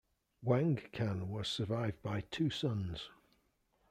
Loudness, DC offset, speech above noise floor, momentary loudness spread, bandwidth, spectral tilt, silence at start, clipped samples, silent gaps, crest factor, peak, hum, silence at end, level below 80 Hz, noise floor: -37 LUFS; under 0.1%; 40 dB; 10 LU; 12.5 kHz; -6.5 dB/octave; 0.4 s; under 0.1%; none; 20 dB; -18 dBFS; none; 0.8 s; -64 dBFS; -76 dBFS